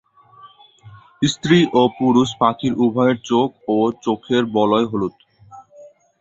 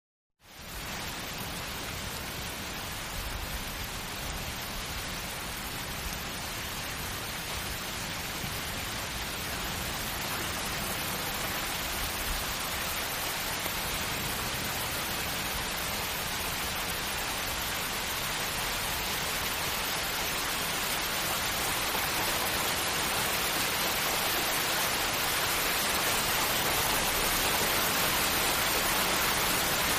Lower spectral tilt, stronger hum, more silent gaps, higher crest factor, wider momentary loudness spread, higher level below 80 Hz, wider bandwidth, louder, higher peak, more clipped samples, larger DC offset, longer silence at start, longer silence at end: first, -6 dB/octave vs -1.5 dB/octave; neither; neither; about the same, 18 dB vs 18 dB; second, 6 LU vs 9 LU; second, -56 dBFS vs -46 dBFS; second, 8 kHz vs 15.5 kHz; first, -18 LUFS vs -30 LUFS; first, -2 dBFS vs -12 dBFS; neither; neither; about the same, 0.45 s vs 0.45 s; first, 0.35 s vs 0 s